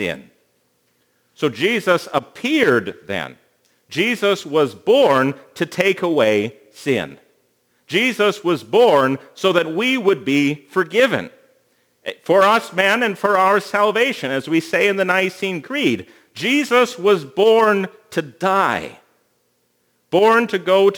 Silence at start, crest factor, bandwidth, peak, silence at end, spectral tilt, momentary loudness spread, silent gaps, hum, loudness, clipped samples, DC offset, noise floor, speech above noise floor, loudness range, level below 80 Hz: 0 s; 18 dB; over 20 kHz; 0 dBFS; 0 s; -4.5 dB/octave; 12 LU; none; none; -17 LUFS; under 0.1%; under 0.1%; -65 dBFS; 48 dB; 3 LU; -68 dBFS